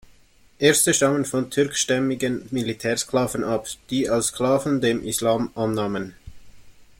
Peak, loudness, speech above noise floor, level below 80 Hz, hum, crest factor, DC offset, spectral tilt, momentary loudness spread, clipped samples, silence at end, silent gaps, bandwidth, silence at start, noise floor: -2 dBFS; -22 LUFS; 32 dB; -52 dBFS; none; 20 dB; under 0.1%; -3.5 dB/octave; 9 LU; under 0.1%; 0.15 s; none; 16.5 kHz; 0.6 s; -54 dBFS